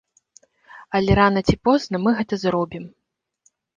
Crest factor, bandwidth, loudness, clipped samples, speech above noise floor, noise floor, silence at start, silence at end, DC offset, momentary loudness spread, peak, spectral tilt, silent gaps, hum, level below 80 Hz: 20 dB; 7.4 kHz; -20 LUFS; under 0.1%; 45 dB; -65 dBFS; 0.75 s; 0.9 s; under 0.1%; 12 LU; -2 dBFS; -6.5 dB/octave; none; none; -40 dBFS